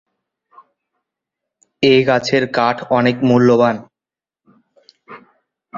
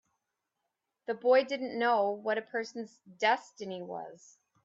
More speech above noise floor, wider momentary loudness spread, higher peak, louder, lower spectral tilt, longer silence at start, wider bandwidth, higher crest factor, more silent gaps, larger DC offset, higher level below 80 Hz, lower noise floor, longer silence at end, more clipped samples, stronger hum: first, 76 dB vs 54 dB; second, 6 LU vs 17 LU; first, -2 dBFS vs -14 dBFS; first, -14 LUFS vs -31 LUFS; first, -6 dB/octave vs -4 dB/octave; first, 1.8 s vs 1.1 s; about the same, 7.4 kHz vs 7.6 kHz; about the same, 16 dB vs 18 dB; neither; neither; first, -58 dBFS vs -86 dBFS; first, -89 dBFS vs -85 dBFS; second, 0 s vs 0.5 s; neither; neither